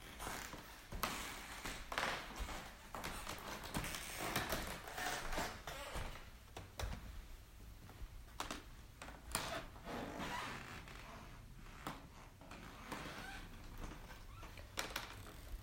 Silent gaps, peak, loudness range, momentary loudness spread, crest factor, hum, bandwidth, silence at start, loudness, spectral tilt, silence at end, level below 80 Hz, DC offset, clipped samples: none; -18 dBFS; 8 LU; 14 LU; 30 dB; none; 16 kHz; 0 s; -47 LUFS; -3 dB/octave; 0 s; -54 dBFS; under 0.1%; under 0.1%